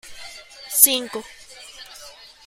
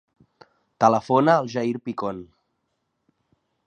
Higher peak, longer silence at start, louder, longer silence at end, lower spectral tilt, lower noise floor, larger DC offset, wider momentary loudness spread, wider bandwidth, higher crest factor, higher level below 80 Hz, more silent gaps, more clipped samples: about the same, 0 dBFS vs -2 dBFS; second, 0.05 s vs 0.8 s; first, -16 LUFS vs -22 LUFS; second, 0.35 s vs 1.45 s; second, 1 dB/octave vs -6.5 dB/octave; second, -44 dBFS vs -75 dBFS; neither; first, 26 LU vs 12 LU; first, 16.5 kHz vs 9 kHz; about the same, 24 dB vs 22 dB; first, -60 dBFS vs -66 dBFS; neither; neither